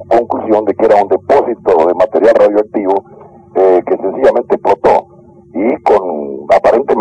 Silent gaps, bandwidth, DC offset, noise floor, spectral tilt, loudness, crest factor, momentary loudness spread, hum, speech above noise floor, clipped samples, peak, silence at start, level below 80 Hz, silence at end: none; 9.8 kHz; under 0.1%; -40 dBFS; -7 dB/octave; -11 LUFS; 10 dB; 7 LU; none; 30 dB; under 0.1%; -2 dBFS; 0 s; -46 dBFS; 0 s